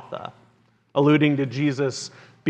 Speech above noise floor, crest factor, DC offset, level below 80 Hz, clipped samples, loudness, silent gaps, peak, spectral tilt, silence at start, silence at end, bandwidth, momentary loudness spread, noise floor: 40 dB; 18 dB; under 0.1%; -74 dBFS; under 0.1%; -21 LUFS; none; -6 dBFS; -6.5 dB/octave; 0 s; 0 s; 9.2 kHz; 19 LU; -61 dBFS